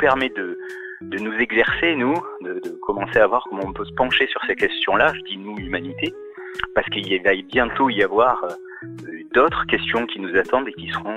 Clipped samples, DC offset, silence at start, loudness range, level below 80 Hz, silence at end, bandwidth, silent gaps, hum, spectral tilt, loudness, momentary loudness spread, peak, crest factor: under 0.1%; under 0.1%; 0 s; 2 LU; -48 dBFS; 0 s; 11.5 kHz; none; none; -5.5 dB/octave; -21 LUFS; 13 LU; -4 dBFS; 18 dB